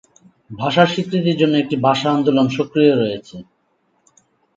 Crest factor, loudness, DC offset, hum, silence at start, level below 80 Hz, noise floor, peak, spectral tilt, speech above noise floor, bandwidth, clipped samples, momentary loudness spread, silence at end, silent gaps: 18 dB; -17 LUFS; under 0.1%; none; 0.5 s; -60 dBFS; -64 dBFS; 0 dBFS; -6.5 dB/octave; 48 dB; 7.8 kHz; under 0.1%; 8 LU; 1.15 s; none